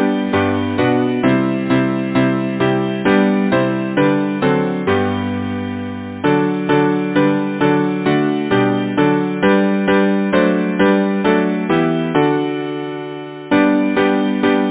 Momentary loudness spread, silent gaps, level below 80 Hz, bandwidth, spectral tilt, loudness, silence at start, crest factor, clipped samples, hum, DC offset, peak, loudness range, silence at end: 7 LU; none; -46 dBFS; 4 kHz; -11 dB/octave; -16 LUFS; 0 s; 16 dB; under 0.1%; none; under 0.1%; 0 dBFS; 2 LU; 0 s